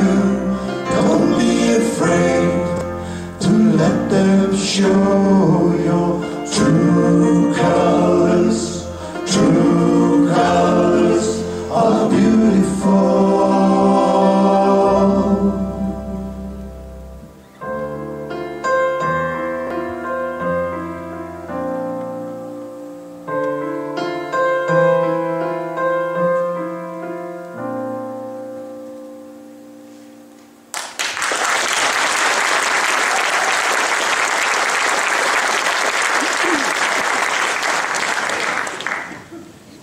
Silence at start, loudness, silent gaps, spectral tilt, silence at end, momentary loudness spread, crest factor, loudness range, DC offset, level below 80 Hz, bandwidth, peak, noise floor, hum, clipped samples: 0 s; -16 LUFS; none; -5 dB/octave; 0.05 s; 15 LU; 14 dB; 11 LU; under 0.1%; -44 dBFS; 15.5 kHz; -2 dBFS; -44 dBFS; none; under 0.1%